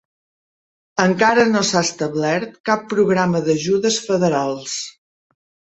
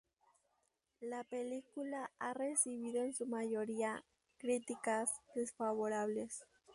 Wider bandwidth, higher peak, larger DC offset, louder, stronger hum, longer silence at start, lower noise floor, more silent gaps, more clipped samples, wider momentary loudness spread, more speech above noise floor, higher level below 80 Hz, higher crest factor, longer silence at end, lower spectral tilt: second, 8.2 kHz vs 11.5 kHz; first, 0 dBFS vs -22 dBFS; neither; first, -18 LUFS vs -41 LUFS; neither; about the same, 0.95 s vs 1 s; first, under -90 dBFS vs -83 dBFS; first, 2.60-2.64 s vs none; neither; about the same, 10 LU vs 9 LU; first, over 72 dB vs 42 dB; first, -58 dBFS vs -84 dBFS; about the same, 18 dB vs 20 dB; first, 0.85 s vs 0 s; about the same, -4.5 dB/octave vs -3.5 dB/octave